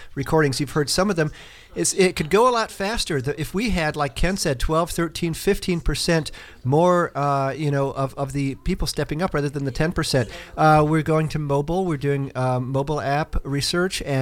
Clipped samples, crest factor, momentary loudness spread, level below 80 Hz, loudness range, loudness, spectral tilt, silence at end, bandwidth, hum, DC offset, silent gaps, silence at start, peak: under 0.1%; 16 dB; 8 LU; -34 dBFS; 2 LU; -22 LUFS; -5 dB/octave; 0 s; 16.5 kHz; none; under 0.1%; none; 0 s; -6 dBFS